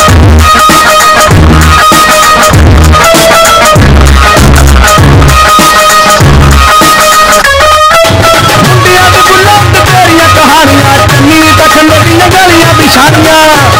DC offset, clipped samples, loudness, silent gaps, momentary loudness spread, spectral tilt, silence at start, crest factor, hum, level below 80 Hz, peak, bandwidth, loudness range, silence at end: under 0.1%; 30%; -2 LUFS; none; 1 LU; -4 dB/octave; 0 s; 2 dB; none; -10 dBFS; 0 dBFS; over 20 kHz; 0 LU; 0 s